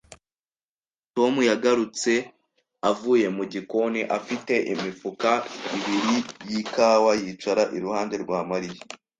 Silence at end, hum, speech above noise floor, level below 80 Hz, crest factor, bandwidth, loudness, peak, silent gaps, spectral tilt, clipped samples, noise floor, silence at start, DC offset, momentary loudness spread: 0.25 s; none; over 66 dB; -68 dBFS; 20 dB; 9.6 kHz; -24 LUFS; -6 dBFS; 0.68-0.79 s; -4 dB/octave; under 0.1%; under -90 dBFS; 0.1 s; under 0.1%; 10 LU